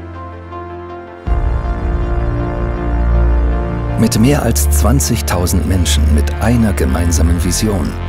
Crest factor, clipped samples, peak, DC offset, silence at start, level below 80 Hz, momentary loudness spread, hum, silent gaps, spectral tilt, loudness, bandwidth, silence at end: 14 dB; under 0.1%; 0 dBFS; under 0.1%; 0 s; -16 dBFS; 15 LU; none; none; -5.5 dB/octave; -14 LUFS; 16.5 kHz; 0 s